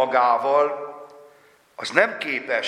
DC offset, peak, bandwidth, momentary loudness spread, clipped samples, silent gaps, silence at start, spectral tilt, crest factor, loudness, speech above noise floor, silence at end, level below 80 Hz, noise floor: under 0.1%; 0 dBFS; 11.5 kHz; 16 LU; under 0.1%; none; 0 s; -3 dB/octave; 22 dB; -21 LUFS; 34 dB; 0 s; -78 dBFS; -55 dBFS